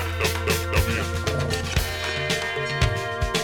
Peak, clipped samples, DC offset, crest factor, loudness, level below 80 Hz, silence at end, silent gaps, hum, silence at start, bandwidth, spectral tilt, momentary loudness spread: -8 dBFS; under 0.1%; under 0.1%; 16 dB; -24 LUFS; -32 dBFS; 0 s; none; none; 0 s; 19 kHz; -4 dB/octave; 3 LU